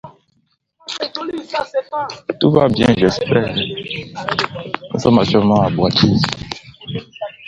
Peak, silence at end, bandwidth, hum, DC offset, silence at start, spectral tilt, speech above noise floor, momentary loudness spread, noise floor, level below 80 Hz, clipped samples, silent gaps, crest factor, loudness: 0 dBFS; 0 s; 10.5 kHz; none; under 0.1%; 0.05 s; -6 dB/octave; 48 dB; 15 LU; -64 dBFS; -44 dBFS; under 0.1%; none; 18 dB; -17 LUFS